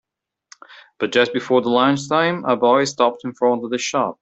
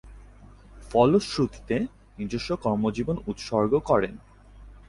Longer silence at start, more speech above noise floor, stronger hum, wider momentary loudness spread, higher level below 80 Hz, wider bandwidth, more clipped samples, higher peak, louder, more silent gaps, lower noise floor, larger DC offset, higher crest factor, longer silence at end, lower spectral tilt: first, 0.7 s vs 0.05 s; first, 33 dB vs 24 dB; neither; second, 5 LU vs 12 LU; second, -64 dBFS vs -48 dBFS; second, 8.2 kHz vs 11.5 kHz; neither; first, -2 dBFS vs -6 dBFS; first, -18 LUFS vs -26 LUFS; neither; about the same, -51 dBFS vs -49 dBFS; neither; about the same, 16 dB vs 20 dB; about the same, 0.1 s vs 0.1 s; second, -4.5 dB/octave vs -6.5 dB/octave